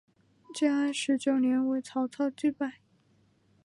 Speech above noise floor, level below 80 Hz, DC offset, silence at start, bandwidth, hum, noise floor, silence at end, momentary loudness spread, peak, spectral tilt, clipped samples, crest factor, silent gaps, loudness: 38 dB; -78 dBFS; under 0.1%; 0.5 s; 11.5 kHz; none; -67 dBFS; 0.95 s; 9 LU; -16 dBFS; -3.5 dB/octave; under 0.1%; 14 dB; none; -29 LUFS